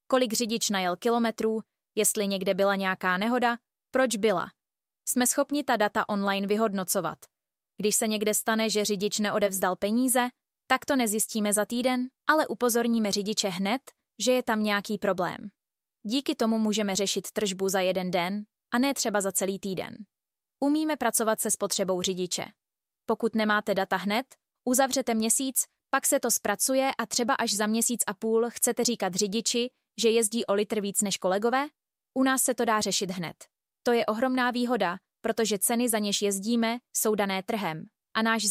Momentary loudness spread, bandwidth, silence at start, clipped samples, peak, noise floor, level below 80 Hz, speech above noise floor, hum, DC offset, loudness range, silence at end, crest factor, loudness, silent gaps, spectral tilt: 7 LU; 16 kHz; 0.1 s; under 0.1%; -8 dBFS; -52 dBFS; -70 dBFS; 25 dB; none; under 0.1%; 3 LU; 0 s; 20 dB; -27 LUFS; none; -3 dB/octave